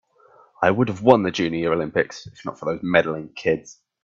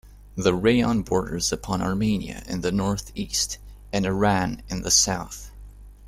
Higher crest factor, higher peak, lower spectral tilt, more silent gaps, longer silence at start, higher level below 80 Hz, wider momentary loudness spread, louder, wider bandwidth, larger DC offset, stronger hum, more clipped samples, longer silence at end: about the same, 22 dB vs 18 dB; first, 0 dBFS vs -6 dBFS; first, -6 dB/octave vs -4 dB/octave; neither; first, 0.6 s vs 0.05 s; second, -58 dBFS vs -42 dBFS; about the same, 11 LU vs 12 LU; first, -21 LUFS vs -24 LUFS; second, 7.6 kHz vs 15.5 kHz; neither; second, none vs 50 Hz at -40 dBFS; neither; first, 0.3 s vs 0 s